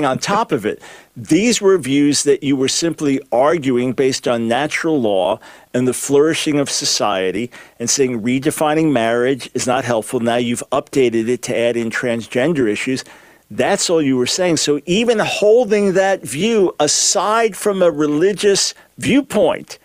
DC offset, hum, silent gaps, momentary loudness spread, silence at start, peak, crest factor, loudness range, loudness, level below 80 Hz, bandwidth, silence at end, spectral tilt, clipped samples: under 0.1%; none; none; 6 LU; 0 s; -2 dBFS; 14 dB; 3 LU; -16 LUFS; -54 dBFS; 16 kHz; 0.1 s; -3.5 dB/octave; under 0.1%